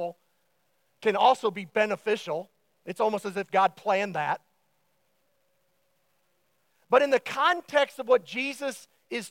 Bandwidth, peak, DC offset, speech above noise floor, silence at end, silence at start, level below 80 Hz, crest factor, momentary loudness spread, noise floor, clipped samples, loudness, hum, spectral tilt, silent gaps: 16.5 kHz; -6 dBFS; under 0.1%; 47 dB; 0 s; 0 s; -88 dBFS; 22 dB; 13 LU; -73 dBFS; under 0.1%; -26 LUFS; none; -4 dB/octave; none